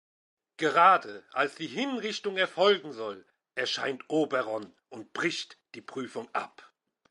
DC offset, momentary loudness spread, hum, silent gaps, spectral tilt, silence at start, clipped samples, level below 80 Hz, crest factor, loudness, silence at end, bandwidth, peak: under 0.1%; 20 LU; none; none; -3.5 dB/octave; 0.6 s; under 0.1%; -84 dBFS; 22 dB; -29 LUFS; 0.65 s; 11.5 kHz; -8 dBFS